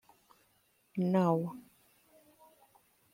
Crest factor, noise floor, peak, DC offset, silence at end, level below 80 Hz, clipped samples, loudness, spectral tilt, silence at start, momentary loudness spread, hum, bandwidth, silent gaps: 20 dB; -72 dBFS; -16 dBFS; under 0.1%; 1.55 s; -80 dBFS; under 0.1%; -32 LUFS; -9 dB/octave; 0.95 s; 15 LU; none; 16 kHz; none